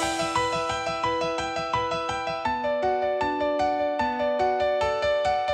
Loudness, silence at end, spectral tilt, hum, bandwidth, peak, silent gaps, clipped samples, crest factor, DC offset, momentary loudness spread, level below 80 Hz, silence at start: -26 LUFS; 0 s; -4 dB/octave; none; 12.5 kHz; -12 dBFS; none; under 0.1%; 14 dB; under 0.1%; 3 LU; -50 dBFS; 0 s